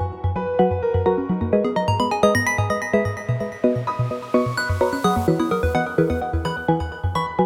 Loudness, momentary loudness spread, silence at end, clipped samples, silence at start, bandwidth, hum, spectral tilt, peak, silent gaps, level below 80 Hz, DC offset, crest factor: -21 LUFS; 5 LU; 0 s; under 0.1%; 0 s; 17.5 kHz; none; -6.5 dB/octave; -2 dBFS; none; -38 dBFS; under 0.1%; 18 dB